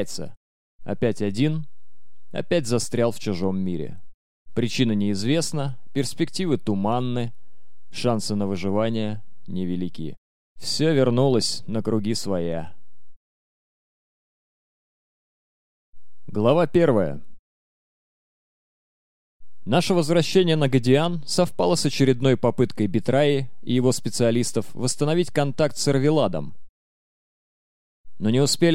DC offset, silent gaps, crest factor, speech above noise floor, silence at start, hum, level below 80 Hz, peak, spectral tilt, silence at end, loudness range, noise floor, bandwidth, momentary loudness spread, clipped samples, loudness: 3%; 0.37-0.79 s, 4.14-4.45 s, 10.18-10.56 s, 13.16-15.93 s, 17.39-19.40 s, 26.69-28.04 s; 20 dB; 49 dB; 0 s; none; -54 dBFS; -4 dBFS; -5.5 dB/octave; 0 s; 7 LU; -71 dBFS; 16 kHz; 14 LU; under 0.1%; -23 LUFS